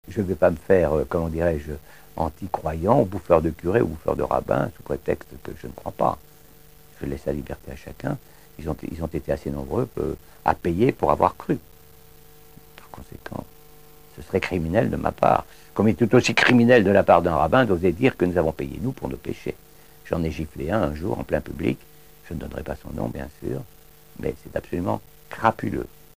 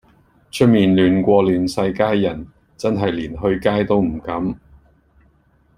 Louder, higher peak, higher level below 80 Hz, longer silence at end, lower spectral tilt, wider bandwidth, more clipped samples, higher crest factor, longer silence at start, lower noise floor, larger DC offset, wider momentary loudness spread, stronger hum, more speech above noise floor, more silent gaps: second, -23 LUFS vs -18 LUFS; about the same, -2 dBFS vs -2 dBFS; about the same, -42 dBFS vs -44 dBFS; second, 0.3 s vs 1.2 s; about the same, -6.5 dB/octave vs -7 dB/octave; first, 16 kHz vs 14.5 kHz; neither; first, 22 dB vs 16 dB; second, 0.05 s vs 0.55 s; second, -51 dBFS vs -57 dBFS; first, 0.5% vs under 0.1%; first, 17 LU vs 11 LU; neither; second, 28 dB vs 40 dB; neither